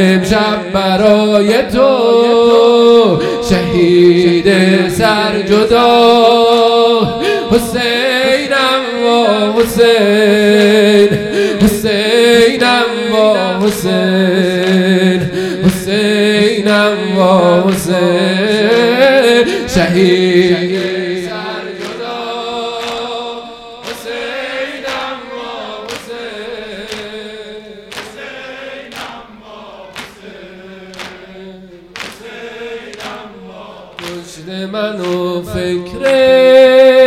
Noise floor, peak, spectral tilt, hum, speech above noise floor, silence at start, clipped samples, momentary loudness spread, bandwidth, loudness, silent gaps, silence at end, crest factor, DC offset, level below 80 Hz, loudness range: -34 dBFS; 0 dBFS; -5 dB/octave; none; 25 dB; 0 s; 0.5%; 20 LU; 16 kHz; -10 LUFS; none; 0 s; 12 dB; under 0.1%; -40 dBFS; 19 LU